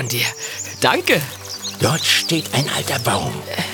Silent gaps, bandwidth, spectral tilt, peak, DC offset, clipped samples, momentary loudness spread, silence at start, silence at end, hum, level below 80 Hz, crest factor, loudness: none; over 20 kHz; -3 dB/octave; 0 dBFS; under 0.1%; under 0.1%; 11 LU; 0 s; 0 s; none; -54 dBFS; 20 dB; -19 LUFS